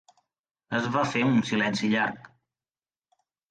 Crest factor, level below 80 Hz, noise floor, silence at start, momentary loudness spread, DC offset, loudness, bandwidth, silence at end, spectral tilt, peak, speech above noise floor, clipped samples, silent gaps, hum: 16 dB; -66 dBFS; under -90 dBFS; 0.7 s; 7 LU; under 0.1%; -26 LUFS; 9.2 kHz; 1.25 s; -5.5 dB/octave; -12 dBFS; over 65 dB; under 0.1%; none; none